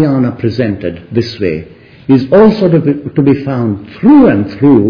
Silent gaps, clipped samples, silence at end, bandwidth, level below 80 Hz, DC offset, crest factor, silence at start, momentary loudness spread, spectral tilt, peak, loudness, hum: none; 0.5%; 0 s; 5.4 kHz; -42 dBFS; under 0.1%; 10 dB; 0 s; 11 LU; -9.5 dB/octave; 0 dBFS; -10 LUFS; none